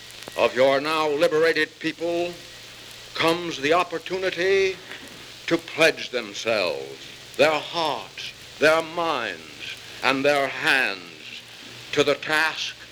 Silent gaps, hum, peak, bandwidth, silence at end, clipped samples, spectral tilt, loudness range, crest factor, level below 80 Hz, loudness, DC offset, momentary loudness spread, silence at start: none; none; -2 dBFS; over 20 kHz; 0 s; under 0.1%; -3.5 dB/octave; 2 LU; 22 dB; -62 dBFS; -23 LUFS; under 0.1%; 17 LU; 0 s